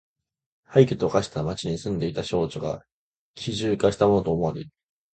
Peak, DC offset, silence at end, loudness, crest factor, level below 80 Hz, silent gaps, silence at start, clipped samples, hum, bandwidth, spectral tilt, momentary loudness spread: -4 dBFS; under 0.1%; 0.45 s; -24 LUFS; 22 dB; -50 dBFS; 2.92-3.34 s; 0.7 s; under 0.1%; none; 9 kHz; -6.5 dB/octave; 13 LU